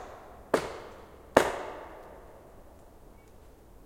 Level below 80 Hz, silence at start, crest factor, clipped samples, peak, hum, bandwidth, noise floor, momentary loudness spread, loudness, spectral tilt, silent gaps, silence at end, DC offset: -54 dBFS; 0 s; 34 dB; under 0.1%; 0 dBFS; none; 16.5 kHz; -53 dBFS; 26 LU; -30 LUFS; -4 dB/octave; none; 0.35 s; under 0.1%